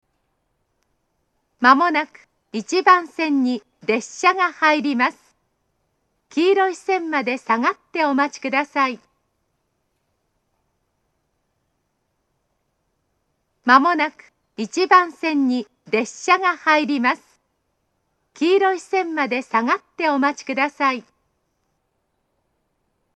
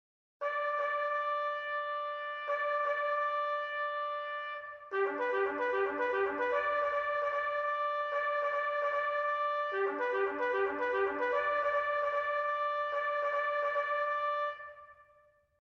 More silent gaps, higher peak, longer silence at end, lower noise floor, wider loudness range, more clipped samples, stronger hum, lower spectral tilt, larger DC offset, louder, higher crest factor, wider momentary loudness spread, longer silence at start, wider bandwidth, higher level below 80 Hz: neither; first, 0 dBFS vs -20 dBFS; first, 2.15 s vs 0.6 s; first, -72 dBFS vs -66 dBFS; first, 5 LU vs 2 LU; neither; neither; about the same, -3 dB/octave vs -4 dB/octave; neither; first, -19 LUFS vs -33 LUFS; first, 22 dB vs 14 dB; first, 9 LU vs 5 LU; first, 1.6 s vs 0.4 s; first, 9.8 kHz vs 6.8 kHz; about the same, -76 dBFS vs -74 dBFS